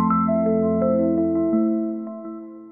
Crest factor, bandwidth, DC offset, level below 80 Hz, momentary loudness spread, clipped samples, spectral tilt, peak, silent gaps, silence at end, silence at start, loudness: 12 dB; 2.3 kHz; under 0.1%; -60 dBFS; 14 LU; under 0.1%; -13 dB/octave; -10 dBFS; none; 0 s; 0 s; -21 LUFS